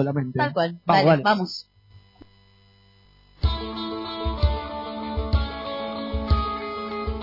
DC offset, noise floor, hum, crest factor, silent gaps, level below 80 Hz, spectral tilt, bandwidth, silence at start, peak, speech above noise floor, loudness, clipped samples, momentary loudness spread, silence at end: under 0.1%; -56 dBFS; none; 18 dB; none; -32 dBFS; -7.5 dB/octave; 5.8 kHz; 0 s; -8 dBFS; 35 dB; -25 LUFS; under 0.1%; 12 LU; 0 s